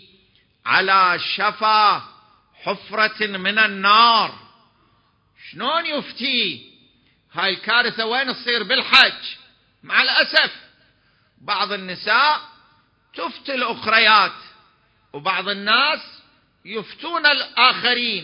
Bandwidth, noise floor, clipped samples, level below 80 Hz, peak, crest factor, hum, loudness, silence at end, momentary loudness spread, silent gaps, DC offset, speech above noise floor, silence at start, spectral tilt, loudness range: 8 kHz; -61 dBFS; under 0.1%; -68 dBFS; 0 dBFS; 20 dB; none; -17 LUFS; 0 s; 16 LU; none; under 0.1%; 42 dB; 0.65 s; -3.5 dB/octave; 5 LU